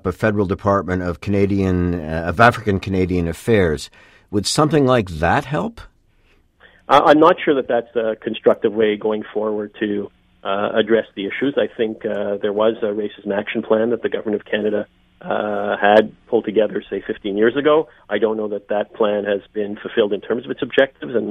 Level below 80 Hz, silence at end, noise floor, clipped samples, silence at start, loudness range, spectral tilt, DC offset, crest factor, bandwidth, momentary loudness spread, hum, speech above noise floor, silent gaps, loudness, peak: -44 dBFS; 0 s; -56 dBFS; under 0.1%; 0.05 s; 4 LU; -6 dB/octave; under 0.1%; 18 dB; 14.5 kHz; 10 LU; none; 38 dB; none; -19 LUFS; 0 dBFS